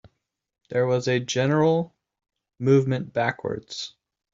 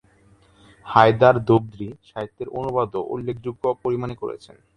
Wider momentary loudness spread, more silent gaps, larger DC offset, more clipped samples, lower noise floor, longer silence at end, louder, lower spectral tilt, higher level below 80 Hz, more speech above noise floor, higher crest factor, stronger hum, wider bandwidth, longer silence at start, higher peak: second, 14 LU vs 18 LU; neither; neither; neither; first, -77 dBFS vs -55 dBFS; about the same, 0.45 s vs 0.4 s; second, -24 LUFS vs -21 LUFS; second, -6 dB/octave vs -8 dB/octave; second, -64 dBFS vs -52 dBFS; first, 54 dB vs 34 dB; about the same, 18 dB vs 22 dB; neither; second, 7.8 kHz vs 9.6 kHz; second, 0.7 s vs 0.85 s; second, -6 dBFS vs 0 dBFS